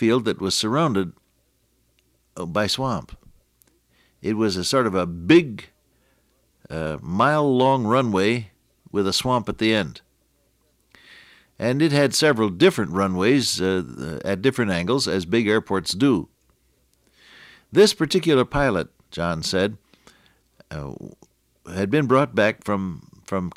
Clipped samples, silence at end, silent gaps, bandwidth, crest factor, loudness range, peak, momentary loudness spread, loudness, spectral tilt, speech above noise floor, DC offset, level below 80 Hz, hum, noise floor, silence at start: under 0.1%; 0.05 s; none; 15.5 kHz; 18 dB; 6 LU; -4 dBFS; 15 LU; -21 LUFS; -5 dB/octave; 45 dB; under 0.1%; -50 dBFS; none; -66 dBFS; 0 s